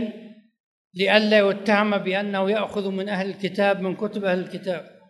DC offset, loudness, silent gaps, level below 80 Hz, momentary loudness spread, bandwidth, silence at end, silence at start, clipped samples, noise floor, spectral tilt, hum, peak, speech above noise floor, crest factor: under 0.1%; -22 LUFS; 0.60-0.91 s; -72 dBFS; 11 LU; 12 kHz; 0.2 s; 0 s; under 0.1%; -43 dBFS; -6 dB/octave; none; -2 dBFS; 21 dB; 22 dB